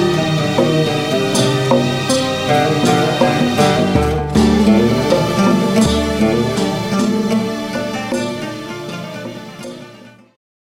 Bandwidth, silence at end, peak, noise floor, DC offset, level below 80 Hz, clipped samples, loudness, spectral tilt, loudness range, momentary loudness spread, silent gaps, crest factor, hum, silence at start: 16.5 kHz; 0.6 s; 0 dBFS; -40 dBFS; under 0.1%; -36 dBFS; under 0.1%; -15 LUFS; -5.5 dB/octave; 7 LU; 13 LU; none; 14 dB; none; 0 s